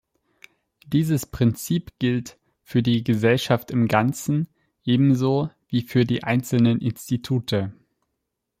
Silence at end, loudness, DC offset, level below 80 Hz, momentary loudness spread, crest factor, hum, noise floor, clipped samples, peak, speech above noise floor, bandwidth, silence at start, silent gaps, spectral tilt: 0.9 s; -22 LUFS; under 0.1%; -54 dBFS; 7 LU; 18 dB; none; -79 dBFS; under 0.1%; -4 dBFS; 58 dB; 16 kHz; 0.9 s; none; -6.5 dB/octave